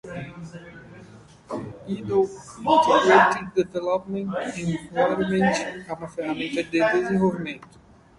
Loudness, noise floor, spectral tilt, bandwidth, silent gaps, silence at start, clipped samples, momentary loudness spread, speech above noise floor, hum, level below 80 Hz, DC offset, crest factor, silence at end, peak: -23 LUFS; -47 dBFS; -5.5 dB/octave; 11.5 kHz; none; 0.05 s; under 0.1%; 19 LU; 25 dB; none; -56 dBFS; under 0.1%; 22 dB; 0.55 s; -2 dBFS